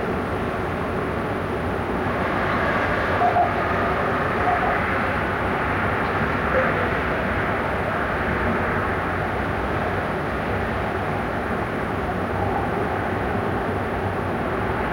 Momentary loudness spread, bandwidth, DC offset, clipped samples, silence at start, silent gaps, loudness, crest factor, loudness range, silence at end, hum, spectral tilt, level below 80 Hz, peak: 5 LU; 16.5 kHz; under 0.1%; under 0.1%; 0 s; none; -23 LUFS; 14 dB; 3 LU; 0 s; none; -7 dB/octave; -38 dBFS; -10 dBFS